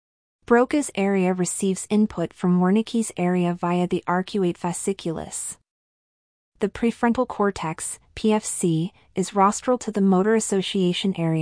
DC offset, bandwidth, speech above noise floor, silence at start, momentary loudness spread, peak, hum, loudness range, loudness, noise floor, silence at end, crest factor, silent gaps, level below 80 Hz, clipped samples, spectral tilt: under 0.1%; 10.5 kHz; over 68 dB; 0.5 s; 9 LU; -6 dBFS; none; 5 LU; -23 LUFS; under -90 dBFS; 0 s; 16 dB; 5.71-6.52 s; -54 dBFS; under 0.1%; -5.5 dB/octave